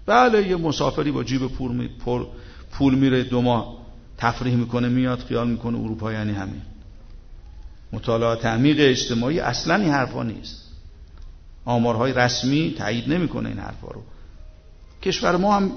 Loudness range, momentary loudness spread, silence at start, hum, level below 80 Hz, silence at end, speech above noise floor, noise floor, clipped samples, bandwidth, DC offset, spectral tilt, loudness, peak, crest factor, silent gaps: 4 LU; 18 LU; 0 s; none; -40 dBFS; 0 s; 23 dB; -45 dBFS; under 0.1%; 6.6 kHz; under 0.1%; -6 dB/octave; -22 LUFS; -2 dBFS; 20 dB; none